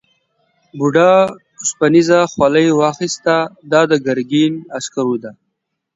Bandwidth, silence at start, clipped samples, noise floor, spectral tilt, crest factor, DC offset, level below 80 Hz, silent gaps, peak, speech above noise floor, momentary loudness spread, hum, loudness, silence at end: 8 kHz; 0.75 s; under 0.1%; -73 dBFS; -5 dB/octave; 14 dB; under 0.1%; -56 dBFS; none; 0 dBFS; 60 dB; 11 LU; none; -15 LUFS; 0.65 s